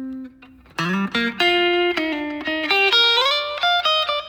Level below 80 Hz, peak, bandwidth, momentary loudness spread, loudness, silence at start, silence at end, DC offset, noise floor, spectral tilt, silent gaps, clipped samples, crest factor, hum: -56 dBFS; -4 dBFS; 19 kHz; 12 LU; -18 LUFS; 0 s; 0 s; under 0.1%; -47 dBFS; -4 dB/octave; none; under 0.1%; 16 dB; none